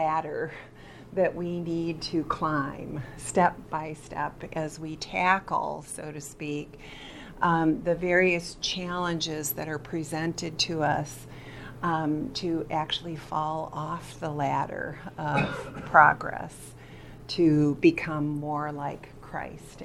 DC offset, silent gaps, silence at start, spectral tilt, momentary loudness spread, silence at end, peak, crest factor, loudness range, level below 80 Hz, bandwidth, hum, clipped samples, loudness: under 0.1%; none; 0 s; -5 dB/octave; 17 LU; 0 s; -2 dBFS; 26 dB; 6 LU; -52 dBFS; 14.5 kHz; none; under 0.1%; -28 LUFS